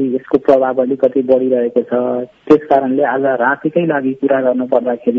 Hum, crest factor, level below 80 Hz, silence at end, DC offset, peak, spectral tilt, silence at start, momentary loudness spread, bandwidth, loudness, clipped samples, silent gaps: none; 14 dB; -56 dBFS; 0 s; under 0.1%; 0 dBFS; -8.5 dB/octave; 0 s; 4 LU; 6.2 kHz; -14 LUFS; 0.2%; none